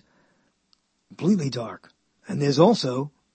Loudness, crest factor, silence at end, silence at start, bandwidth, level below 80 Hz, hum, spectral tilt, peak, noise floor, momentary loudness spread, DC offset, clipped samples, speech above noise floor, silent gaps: -23 LUFS; 22 dB; 0.25 s; 1.2 s; 8.8 kHz; -72 dBFS; none; -6.5 dB/octave; -4 dBFS; -68 dBFS; 16 LU; under 0.1%; under 0.1%; 46 dB; none